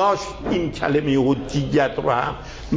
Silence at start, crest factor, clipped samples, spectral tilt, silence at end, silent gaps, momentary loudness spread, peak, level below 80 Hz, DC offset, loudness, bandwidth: 0 s; 16 dB; under 0.1%; -6.5 dB/octave; 0 s; none; 6 LU; -6 dBFS; -40 dBFS; under 0.1%; -21 LUFS; 8 kHz